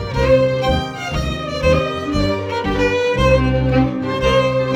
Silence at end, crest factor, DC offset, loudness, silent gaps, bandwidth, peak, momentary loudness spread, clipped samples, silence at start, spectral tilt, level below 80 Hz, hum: 0 s; 16 dB; under 0.1%; -17 LUFS; none; 12 kHz; 0 dBFS; 7 LU; under 0.1%; 0 s; -6.5 dB/octave; -28 dBFS; none